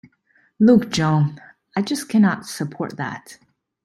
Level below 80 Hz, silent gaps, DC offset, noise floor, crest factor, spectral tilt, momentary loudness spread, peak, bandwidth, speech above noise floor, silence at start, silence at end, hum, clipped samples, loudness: -58 dBFS; none; under 0.1%; -61 dBFS; 16 dB; -6 dB/octave; 14 LU; -4 dBFS; 13.5 kHz; 42 dB; 0.6 s; 0.5 s; none; under 0.1%; -20 LUFS